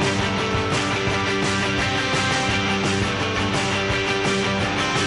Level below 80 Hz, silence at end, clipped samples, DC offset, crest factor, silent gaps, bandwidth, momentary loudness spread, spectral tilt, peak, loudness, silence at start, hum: -40 dBFS; 0 s; under 0.1%; under 0.1%; 12 dB; none; 11.5 kHz; 2 LU; -4 dB/octave; -8 dBFS; -21 LUFS; 0 s; none